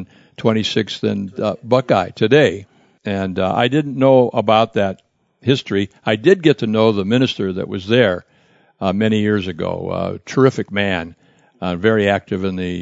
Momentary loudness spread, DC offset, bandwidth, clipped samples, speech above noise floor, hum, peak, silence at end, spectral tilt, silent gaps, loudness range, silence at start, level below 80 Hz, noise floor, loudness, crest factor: 10 LU; under 0.1%; 7.8 kHz; under 0.1%; 38 dB; none; 0 dBFS; 0 s; -6.5 dB/octave; none; 3 LU; 0 s; -54 dBFS; -55 dBFS; -17 LUFS; 18 dB